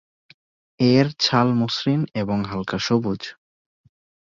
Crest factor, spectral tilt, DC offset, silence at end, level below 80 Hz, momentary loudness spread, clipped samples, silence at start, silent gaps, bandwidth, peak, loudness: 20 dB; -6 dB/octave; under 0.1%; 1 s; -54 dBFS; 9 LU; under 0.1%; 0.8 s; none; 7.6 kHz; -4 dBFS; -21 LUFS